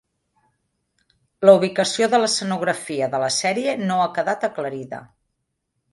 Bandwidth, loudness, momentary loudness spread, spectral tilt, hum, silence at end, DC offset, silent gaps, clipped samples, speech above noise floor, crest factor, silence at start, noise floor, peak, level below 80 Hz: 11.5 kHz; -20 LUFS; 14 LU; -3.5 dB/octave; none; 0.9 s; under 0.1%; none; under 0.1%; 56 dB; 22 dB; 1.4 s; -76 dBFS; 0 dBFS; -68 dBFS